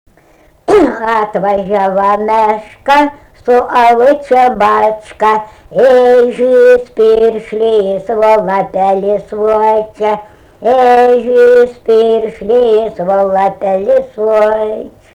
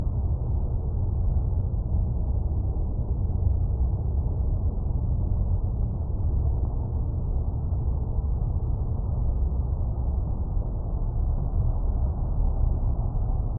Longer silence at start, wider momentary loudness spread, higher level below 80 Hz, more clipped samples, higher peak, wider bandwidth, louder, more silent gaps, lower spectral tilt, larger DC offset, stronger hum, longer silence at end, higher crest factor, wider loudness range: first, 0.7 s vs 0 s; first, 8 LU vs 3 LU; second, -44 dBFS vs -26 dBFS; neither; first, 0 dBFS vs -12 dBFS; first, 10.5 kHz vs 1.5 kHz; first, -10 LUFS vs -28 LUFS; neither; second, -6 dB/octave vs -14 dB/octave; neither; neither; first, 0.25 s vs 0 s; about the same, 10 dB vs 14 dB; about the same, 3 LU vs 1 LU